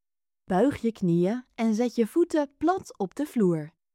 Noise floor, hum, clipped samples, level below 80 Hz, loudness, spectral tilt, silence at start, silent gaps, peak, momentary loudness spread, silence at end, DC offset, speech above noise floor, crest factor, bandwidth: -62 dBFS; none; under 0.1%; -62 dBFS; -26 LUFS; -7.5 dB/octave; 0.5 s; none; -12 dBFS; 6 LU; 0.25 s; under 0.1%; 37 dB; 14 dB; 15.5 kHz